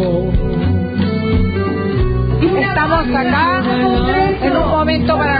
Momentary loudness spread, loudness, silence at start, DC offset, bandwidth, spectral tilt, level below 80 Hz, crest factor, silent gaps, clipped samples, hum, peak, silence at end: 3 LU; -15 LUFS; 0 s; under 0.1%; 5 kHz; -10.5 dB/octave; -24 dBFS; 10 dB; none; under 0.1%; none; -4 dBFS; 0 s